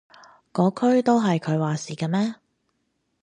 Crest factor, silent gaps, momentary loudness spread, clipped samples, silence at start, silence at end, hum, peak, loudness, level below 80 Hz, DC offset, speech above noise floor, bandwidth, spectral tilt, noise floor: 18 dB; none; 9 LU; under 0.1%; 0.55 s; 0.9 s; none; -6 dBFS; -23 LUFS; -70 dBFS; under 0.1%; 52 dB; 10 kHz; -7 dB/octave; -73 dBFS